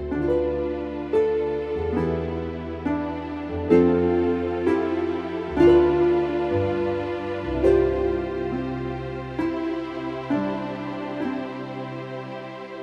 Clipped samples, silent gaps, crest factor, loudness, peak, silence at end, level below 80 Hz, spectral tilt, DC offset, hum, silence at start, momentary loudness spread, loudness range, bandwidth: under 0.1%; none; 20 dB; -24 LUFS; -4 dBFS; 0 s; -42 dBFS; -8.5 dB/octave; under 0.1%; none; 0 s; 12 LU; 8 LU; 6.4 kHz